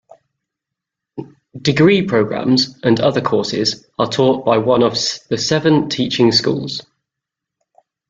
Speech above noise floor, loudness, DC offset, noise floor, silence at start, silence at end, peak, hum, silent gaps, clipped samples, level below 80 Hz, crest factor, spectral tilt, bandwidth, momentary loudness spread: 68 dB; -15 LUFS; under 0.1%; -83 dBFS; 1.15 s; 1.3 s; 0 dBFS; none; none; under 0.1%; -54 dBFS; 16 dB; -5 dB/octave; 9 kHz; 10 LU